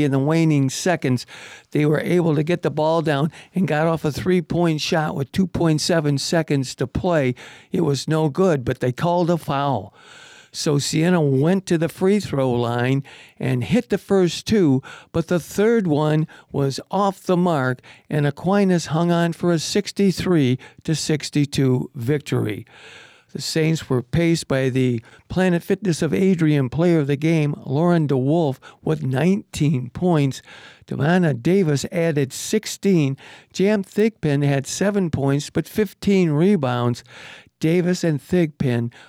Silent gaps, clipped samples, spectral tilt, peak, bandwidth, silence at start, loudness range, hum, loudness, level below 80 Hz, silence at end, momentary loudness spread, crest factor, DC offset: none; under 0.1%; -6 dB/octave; -8 dBFS; 15.5 kHz; 0 s; 2 LU; none; -20 LUFS; -50 dBFS; 0.2 s; 7 LU; 12 dB; under 0.1%